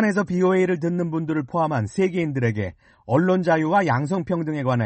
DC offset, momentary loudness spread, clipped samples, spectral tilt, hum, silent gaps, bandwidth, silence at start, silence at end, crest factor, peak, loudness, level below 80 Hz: under 0.1%; 6 LU; under 0.1%; -8 dB/octave; none; none; 8.6 kHz; 0 s; 0 s; 14 dB; -8 dBFS; -22 LUFS; -56 dBFS